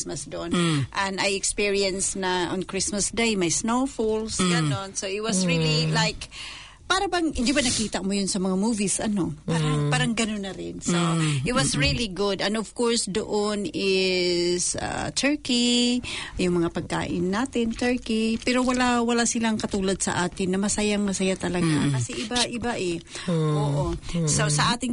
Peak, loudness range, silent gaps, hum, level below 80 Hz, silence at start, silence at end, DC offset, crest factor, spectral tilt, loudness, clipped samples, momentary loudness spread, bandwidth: -10 dBFS; 1 LU; none; none; -44 dBFS; 0 s; 0 s; under 0.1%; 14 dB; -4 dB/octave; -24 LUFS; under 0.1%; 6 LU; 11 kHz